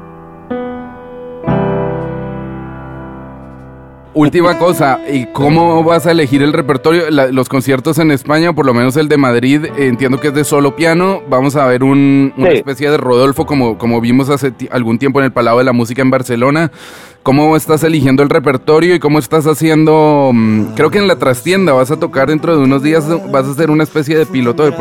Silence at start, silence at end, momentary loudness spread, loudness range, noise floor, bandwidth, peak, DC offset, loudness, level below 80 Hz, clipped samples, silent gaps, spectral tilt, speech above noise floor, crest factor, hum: 0 s; 0 s; 11 LU; 5 LU; -34 dBFS; 17 kHz; 0 dBFS; under 0.1%; -11 LUFS; -42 dBFS; under 0.1%; none; -6.5 dB/octave; 24 dB; 10 dB; none